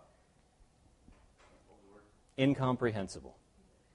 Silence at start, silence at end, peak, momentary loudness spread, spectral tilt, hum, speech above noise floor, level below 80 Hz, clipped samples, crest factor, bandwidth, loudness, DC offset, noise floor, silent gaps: 2.4 s; 0.65 s; -18 dBFS; 19 LU; -6.5 dB/octave; none; 35 dB; -64 dBFS; under 0.1%; 22 dB; 11 kHz; -34 LUFS; under 0.1%; -68 dBFS; none